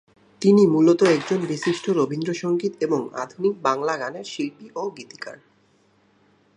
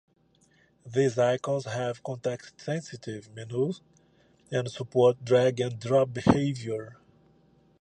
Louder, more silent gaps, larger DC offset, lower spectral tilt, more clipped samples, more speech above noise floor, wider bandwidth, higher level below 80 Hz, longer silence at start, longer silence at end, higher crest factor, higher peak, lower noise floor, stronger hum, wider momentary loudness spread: first, -22 LUFS vs -28 LUFS; neither; neither; about the same, -6 dB/octave vs -6.5 dB/octave; neither; about the same, 39 dB vs 38 dB; about the same, 10.5 kHz vs 9.8 kHz; second, -72 dBFS vs -58 dBFS; second, 0.4 s vs 0.85 s; first, 1.2 s vs 0.85 s; second, 18 dB vs 24 dB; about the same, -6 dBFS vs -6 dBFS; second, -61 dBFS vs -65 dBFS; neither; about the same, 15 LU vs 15 LU